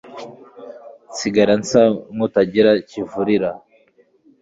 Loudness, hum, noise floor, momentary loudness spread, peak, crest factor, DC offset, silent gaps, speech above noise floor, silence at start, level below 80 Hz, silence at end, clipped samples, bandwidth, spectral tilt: -17 LUFS; none; -56 dBFS; 23 LU; -2 dBFS; 18 dB; under 0.1%; none; 39 dB; 0.05 s; -56 dBFS; 0.85 s; under 0.1%; 7.8 kHz; -5.5 dB/octave